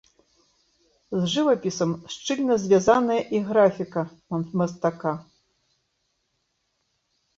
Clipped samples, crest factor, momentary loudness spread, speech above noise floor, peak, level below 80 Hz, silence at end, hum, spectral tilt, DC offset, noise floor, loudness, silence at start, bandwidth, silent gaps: under 0.1%; 20 dB; 11 LU; 51 dB; -4 dBFS; -62 dBFS; 2.15 s; none; -5.5 dB/octave; under 0.1%; -74 dBFS; -24 LUFS; 1.1 s; 7.8 kHz; none